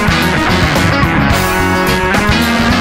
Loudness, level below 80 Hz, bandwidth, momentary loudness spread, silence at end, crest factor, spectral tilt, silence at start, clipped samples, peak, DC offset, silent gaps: -11 LUFS; -22 dBFS; 16.5 kHz; 1 LU; 0 s; 10 dB; -5 dB/octave; 0 s; under 0.1%; 0 dBFS; under 0.1%; none